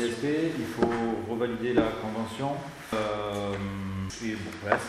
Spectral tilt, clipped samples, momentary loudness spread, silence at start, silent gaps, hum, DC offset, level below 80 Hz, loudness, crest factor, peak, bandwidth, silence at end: -6 dB/octave; under 0.1%; 7 LU; 0 s; none; none; under 0.1%; -54 dBFS; -30 LUFS; 22 dB; -6 dBFS; 15 kHz; 0 s